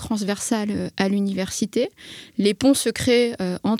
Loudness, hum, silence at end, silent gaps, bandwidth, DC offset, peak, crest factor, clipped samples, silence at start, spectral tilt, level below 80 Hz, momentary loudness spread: -22 LUFS; none; 0 s; none; 16 kHz; under 0.1%; -6 dBFS; 16 dB; under 0.1%; 0 s; -4.5 dB/octave; -52 dBFS; 7 LU